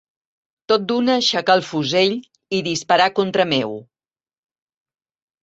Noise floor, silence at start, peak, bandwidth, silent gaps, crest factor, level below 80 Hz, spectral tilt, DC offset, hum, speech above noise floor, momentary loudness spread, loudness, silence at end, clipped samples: under -90 dBFS; 0.7 s; -2 dBFS; 8.2 kHz; none; 18 dB; -64 dBFS; -4 dB/octave; under 0.1%; none; over 72 dB; 9 LU; -18 LUFS; 1.6 s; under 0.1%